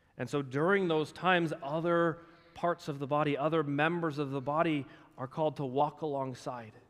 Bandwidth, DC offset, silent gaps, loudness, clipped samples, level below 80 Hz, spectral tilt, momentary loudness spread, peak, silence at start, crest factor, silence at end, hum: 13 kHz; under 0.1%; none; -32 LUFS; under 0.1%; -72 dBFS; -7 dB/octave; 9 LU; -14 dBFS; 0.15 s; 20 dB; 0.1 s; none